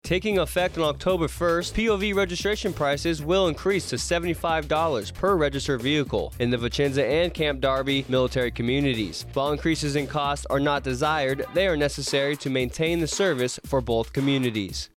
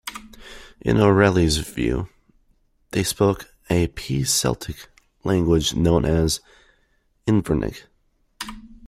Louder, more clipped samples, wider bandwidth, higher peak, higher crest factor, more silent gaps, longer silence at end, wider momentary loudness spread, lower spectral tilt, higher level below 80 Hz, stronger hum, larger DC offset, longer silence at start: second, -24 LUFS vs -21 LUFS; neither; about the same, 16.5 kHz vs 16 kHz; second, -12 dBFS vs -2 dBFS; second, 12 dB vs 20 dB; neither; about the same, 0.1 s vs 0 s; second, 3 LU vs 18 LU; about the same, -5 dB/octave vs -5 dB/octave; about the same, -40 dBFS vs -38 dBFS; neither; neither; about the same, 0.05 s vs 0.05 s